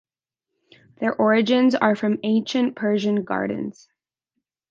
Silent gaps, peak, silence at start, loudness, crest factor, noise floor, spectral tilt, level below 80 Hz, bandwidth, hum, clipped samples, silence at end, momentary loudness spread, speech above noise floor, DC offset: none; -2 dBFS; 1 s; -21 LUFS; 20 dB; -85 dBFS; -6 dB/octave; -68 dBFS; 7.4 kHz; none; under 0.1%; 1 s; 10 LU; 64 dB; under 0.1%